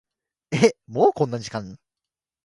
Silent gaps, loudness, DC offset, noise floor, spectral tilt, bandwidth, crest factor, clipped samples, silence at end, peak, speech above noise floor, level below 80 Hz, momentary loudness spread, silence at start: none; -22 LUFS; under 0.1%; -88 dBFS; -5.5 dB/octave; 11.5 kHz; 24 dB; under 0.1%; 0.7 s; 0 dBFS; 67 dB; -60 dBFS; 13 LU; 0.5 s